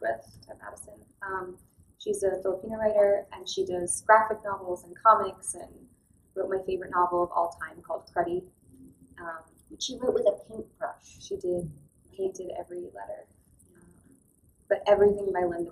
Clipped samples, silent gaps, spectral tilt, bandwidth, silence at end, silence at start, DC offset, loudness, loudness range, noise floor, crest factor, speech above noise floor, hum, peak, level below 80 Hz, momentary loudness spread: under 0.1%; none; -4 dB/octave; 13.5 kHz; 0 s; 0 s; under 0.1%; -28 LUFS; 11 LU; -63 dBFS; 24 dB; 36 dB; none; -6 dBFS; -60 dBFS; 21 LU